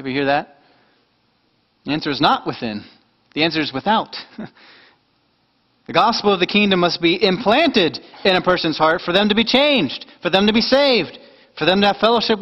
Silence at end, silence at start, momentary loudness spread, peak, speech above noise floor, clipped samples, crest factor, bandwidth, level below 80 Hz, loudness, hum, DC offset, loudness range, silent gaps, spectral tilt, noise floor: 0 s; 0 s; 13 LU; 0 dBFS; 46 dB; under 0.1%; 18 dB; 8.4 kHz; -52 dBFS; -17 LUFS; none; under 0.1%; 7 LU; none; -5.5 dB/octave; -63 dBFS